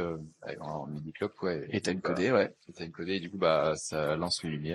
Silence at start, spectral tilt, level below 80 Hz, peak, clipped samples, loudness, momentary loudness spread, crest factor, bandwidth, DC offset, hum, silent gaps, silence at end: 0 s; -5 dB/octave; -62 dBFS; -12 dBFS; under 0.1%; -32 LUFS; 14 LU; 20 dB; 13 kHz; under 0.1%; none; none; 0 s